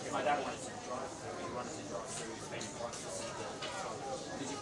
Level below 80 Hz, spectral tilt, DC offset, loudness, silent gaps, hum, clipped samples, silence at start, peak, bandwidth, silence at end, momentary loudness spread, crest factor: -68 dBFS; -3 dB/octave; under 0.1%; -41 LUFS; none; none; under 0.1%; 0 s; -20 dBFS; 11.5 kHz; 0 s; 7 LU; 20 dB